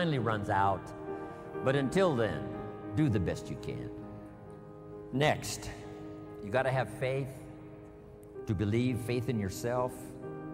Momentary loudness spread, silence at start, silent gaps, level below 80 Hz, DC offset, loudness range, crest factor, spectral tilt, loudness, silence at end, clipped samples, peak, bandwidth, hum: 19 LU; 0 s; none; -56 dBFS; under 0.1%; 4 LU; 18 dB; -6 dB/octave; -33 LUFS; 0 s; under 0.1%; -16 dBFS; 16 kHz; none